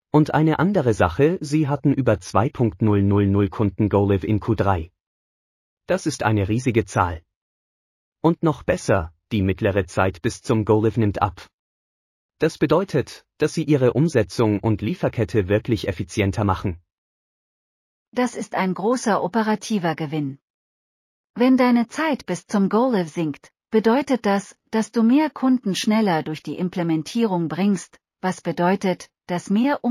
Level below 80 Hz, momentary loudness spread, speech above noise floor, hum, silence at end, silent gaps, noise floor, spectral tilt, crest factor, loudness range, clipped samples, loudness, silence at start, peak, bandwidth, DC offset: -48 dBFS; 8 LU; over 70 dB; none; 0 s; 5.00-5.77 s, 7.36-8.12 s, 11.53-12.29 s, 16.92-18.12 s, 20.42-21.34 s; under -90 dBFS; -6.5 dB/octave; 18 dB; 4 LU; under 0.1%; -21 LUFS; 0.15 s; -4 dBFS; 14.5 kHz; under 0.1%